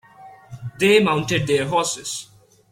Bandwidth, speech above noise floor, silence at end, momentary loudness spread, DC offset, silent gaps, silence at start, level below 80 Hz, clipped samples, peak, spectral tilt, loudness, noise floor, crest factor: 16.5 kHz; 26 dB; 0.45 s; 17 LU; under 0.1%; none; 0.2 s; -56 dBFS; under 0.1%; -4 dBFS; -4 dB/octave; -19 LUFS; -45 dBFS; 18 dB